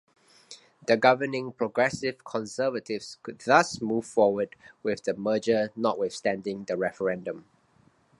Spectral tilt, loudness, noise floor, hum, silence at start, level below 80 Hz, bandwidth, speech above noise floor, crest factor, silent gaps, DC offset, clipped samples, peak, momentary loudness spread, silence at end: -4.5 dB/octave; -27 LUFS; -63 dBFS; none; 0.5 s; -68 dBFS; 11.5 kHz; 36 dB; 24 dB; none; under 0.1%; under 0.1%; -4 dBFS; 13 LU; 0.8 s